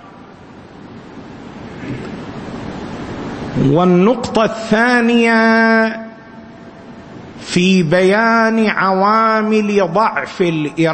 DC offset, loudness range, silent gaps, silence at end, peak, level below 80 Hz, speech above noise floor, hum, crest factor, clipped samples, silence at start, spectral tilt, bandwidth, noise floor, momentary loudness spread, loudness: under 0.1%; 9 LU; none; 0 s; 0 dBFS; -46 dBFS; 25 dB; none; 14 dB; under 0.1%; 0 s; -6 dB/octave; 8.8 kHz; -37 dBFS; 22 LU; -13 LUFS